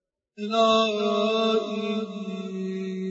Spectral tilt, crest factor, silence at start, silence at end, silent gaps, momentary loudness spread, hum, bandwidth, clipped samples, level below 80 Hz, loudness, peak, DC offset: -5 dB/octave; 16 dB; 0.4 s; 0 s; none; 12 LU; none; 8 kHz; under 0.1%; -70 dBFS; -25 LUFS; -8 dBFS; under 0.1%